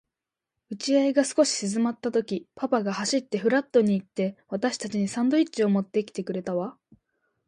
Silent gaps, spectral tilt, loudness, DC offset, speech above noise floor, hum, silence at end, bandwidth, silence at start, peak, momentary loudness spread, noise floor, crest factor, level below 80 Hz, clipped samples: none; -5 dB/octave; -26 LUFS; under 0.1%; 63 dB; none; 0.75 s; 11.5 kHz; 0.7 s; -8 dBFS; 9 LU; -88 dBFS; 18 dB; -72 dBFS; under 0.1%